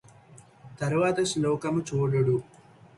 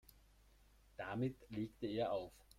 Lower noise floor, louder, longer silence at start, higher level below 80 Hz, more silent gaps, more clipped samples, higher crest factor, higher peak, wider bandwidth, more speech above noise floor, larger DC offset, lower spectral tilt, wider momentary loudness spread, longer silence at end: second, -53 dBFS vs -69 dBFS; first, -27 LUFS vs -44 LUFS; second, 0.65 s vs 1 s; first, -60 dBFS vs -68 dBFS; neither; neither; about the same, 16 dB vs 18 dB; first, -12 dBFS vs -28 dBFS; second, 11.5 kHz vs 16 kHz; about the same, 27 dB vs 25 dB; neither; second, -6 dB/octave vs -7.5 dB/octave; second, 5 LU vs 8 LU; first, 0.55 s vs 0.15 s